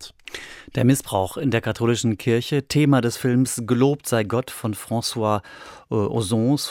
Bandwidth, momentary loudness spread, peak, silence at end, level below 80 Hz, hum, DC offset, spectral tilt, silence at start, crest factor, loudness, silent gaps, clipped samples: 17.5 kHz; 10 LU; -6 dBFS; 0 s; -56 dBFS; none; under 0.1%; -5.5 dB/octave; 0 s; 16 dB; -22 LUFS; none; under 0.1%